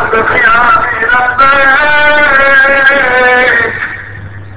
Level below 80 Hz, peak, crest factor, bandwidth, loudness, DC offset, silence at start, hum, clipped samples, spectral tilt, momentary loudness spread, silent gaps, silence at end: -34 dBFS; 0 dBFS; 8 dB; 4 kHz; -6 LUFS; 6%; 0 s; none; 1%; -7 dB/octave; 12 LU; none; 0 s